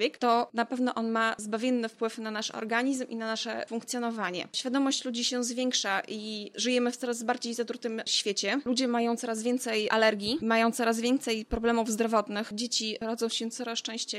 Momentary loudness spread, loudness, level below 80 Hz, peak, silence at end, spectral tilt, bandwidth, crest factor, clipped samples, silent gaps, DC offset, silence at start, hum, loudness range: 7 LU; -29 LUFS; -58 dBFS; -10 dBFS; 0 s; -2.5 dB/octave; 14.5 kHz; 18 dB; under 0.1%; none; under 0.1%; 0 s; none; 4 LU